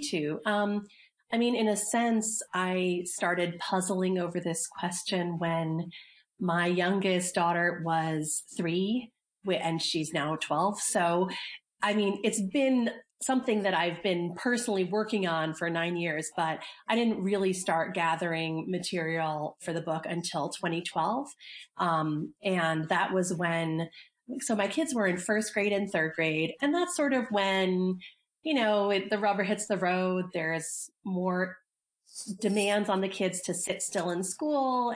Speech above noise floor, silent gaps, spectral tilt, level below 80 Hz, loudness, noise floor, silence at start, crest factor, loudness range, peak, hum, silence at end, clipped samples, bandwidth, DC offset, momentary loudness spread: 38 dB; none; -4 dB/octave; -76 dBFS; -30 LUFS; -68 dBFS; 0 s; 16 dB; 3 LU; -14 dBFS; none; 0 s; under 0.1%; 10.5 kHz; under 0.1%; 7 LU